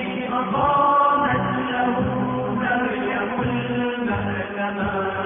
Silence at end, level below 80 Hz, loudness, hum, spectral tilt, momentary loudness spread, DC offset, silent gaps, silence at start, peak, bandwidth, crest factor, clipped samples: 0 s; -46 dBFS; -22 LUFS; none; -10.5 dB/octave; 8 LU; under 0.1%; none; 0 s; -8 dBFS; 3.8 kHz; 14 dB; under 0.1%